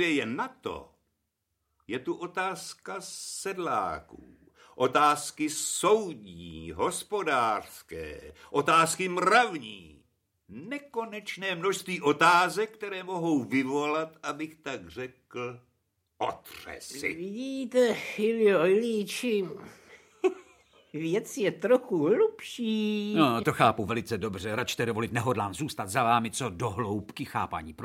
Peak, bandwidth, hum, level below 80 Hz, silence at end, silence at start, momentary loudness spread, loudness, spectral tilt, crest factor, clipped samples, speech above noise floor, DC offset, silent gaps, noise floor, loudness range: -6 dBFS; 16.5 kHz; none; -64 dBFS; 0 s; 0 s; 17 LU; -28 LUFS; -4 dB/octave; 24 dB; under 0.1%; 52 dB; under 0.1%; none; -81 dBFS; 8 LU